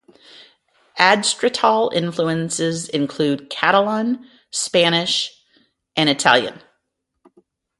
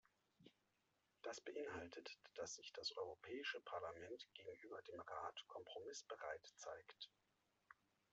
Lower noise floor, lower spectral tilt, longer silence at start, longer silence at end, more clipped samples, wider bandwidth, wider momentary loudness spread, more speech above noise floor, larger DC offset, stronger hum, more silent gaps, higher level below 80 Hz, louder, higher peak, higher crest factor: second, -74 dBFS vs -86 dBFS; first, -3 dB/octave vs -1 dB/octave; first, 0.95 s vs 0.4 s; first, 1.2 s vs 0.4 s; neither; first, 11.5 kHz vs 7.6 kHz; first, 11 LU vs 8 LU; first, 56 dB vs 32 dB; neither; neither; neither; first, -64 dBFS vs -88 dBFS; first, -18 LUFS vs -53 LUFS; first, 0 dBFS vs -34 dBFS; about the same, 20 dB vs 22 dB